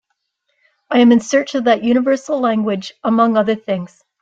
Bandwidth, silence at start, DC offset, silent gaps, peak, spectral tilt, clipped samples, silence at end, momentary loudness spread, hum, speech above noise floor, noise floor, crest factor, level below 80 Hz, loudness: 7.8 kHz; 0.9 s; under 0.1%; none; -2 dBFS; -5.5 dB/octave; under 0.1%; 0.35 s; 10 LU; none; 55 dB; -70 dBFS; 14 dB; -62 dBFS; -16 LUFS